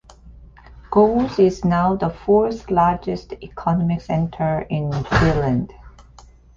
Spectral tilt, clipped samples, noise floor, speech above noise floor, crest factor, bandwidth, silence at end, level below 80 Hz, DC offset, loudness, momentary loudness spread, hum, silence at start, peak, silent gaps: -8 dB/octave; under 0.1%; -46 dBFS; 28 dB; 18 dB; 7.4 kHz; 0.65 s; -38 dBFS; under 0.1%; -19 LUFS; 9 LU; none; 0.25 s; -2 dBFS; none